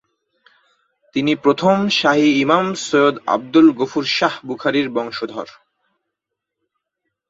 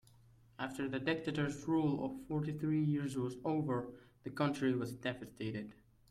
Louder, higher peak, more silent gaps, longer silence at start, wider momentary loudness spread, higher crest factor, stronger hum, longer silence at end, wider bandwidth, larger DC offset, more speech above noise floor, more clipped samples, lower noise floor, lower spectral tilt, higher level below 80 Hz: first, -17 LUFS vs -38 LUFS; first, -2 dBFS vs -22 dBFS; neither; first, 1.15 s vs 0.6 s; about the same, 12 LU vs 10 LU; about the same, 18 dB vs 16 dB; neither; first, 1.8 s vs 0.4 s; second, 7.8 kHz vs 14 kHz; neither; first, 64 dB vs 27 dB; neither; first, -81 dBFS vs -65 dBFS; second, -5 dB/octave vs -7 dB/octave; about the same, -64 dBFS vs -68 dBFS